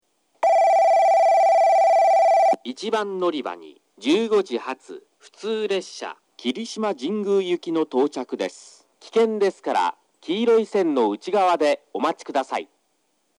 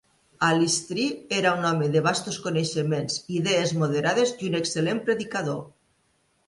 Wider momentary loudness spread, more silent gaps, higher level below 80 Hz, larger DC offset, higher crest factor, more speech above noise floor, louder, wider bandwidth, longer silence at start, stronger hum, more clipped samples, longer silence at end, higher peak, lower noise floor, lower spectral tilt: first, 14 LU vs 5 LU; neither; second, -86 dBFS vs -64 dBFS; neither; about the same, 14 dB vs 18 dB; about the same, 46 dB vs 43 dB; first, -21 LUFS vs -25 LUFS; about the same, 12 kHz vs 11.5 kHz; about the same, 0.4 s vs 0.4 s; neither; neither; about the same, 0.75 s vs 0.8 s; about the same, -8 dBFS vs -8 dBFS; about the same, -70 dBFS vs -68 dBFS; about the same, -4.5 dB/octave vs -4.5 dB/octave